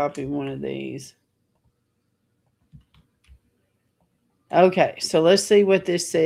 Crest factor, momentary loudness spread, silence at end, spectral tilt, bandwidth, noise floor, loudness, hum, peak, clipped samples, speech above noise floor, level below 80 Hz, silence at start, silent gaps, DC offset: 20 dB; 14 LU; 0 s; -4.5 dB/octave; 16 kHz; -72 dBFS; -20 LUFS; none; -4 dBFS; under 0.1%; 52 dB; -62 dBFS; 0 s; none; under 0.1%